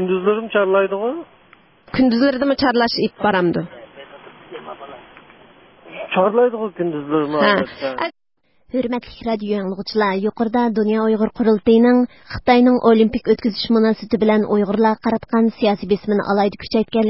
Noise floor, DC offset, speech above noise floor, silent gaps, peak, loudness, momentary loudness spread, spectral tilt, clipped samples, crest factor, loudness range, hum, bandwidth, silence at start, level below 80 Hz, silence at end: -51 dBFS; 0.1%; 34 dB; none; 0 dBFS; -18 LUFS; 12 LU; -10 dB/octave; under 0.1%; 18 dB; 7 LU; none; 5.8 kHz; 0 s; -50 dBFS; 0 s